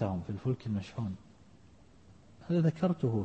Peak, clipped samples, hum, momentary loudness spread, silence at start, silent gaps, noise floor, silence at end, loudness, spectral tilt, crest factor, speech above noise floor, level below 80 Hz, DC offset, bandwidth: -18 dBFS; under 0.1%; none; 11 LU; 0 s; none; -59 dBFS; 0 s; -33 LUFS; -9 dB/octave; 16 dB; 28 dB; -62 dBFS; under 0.1%; 8.2 kHz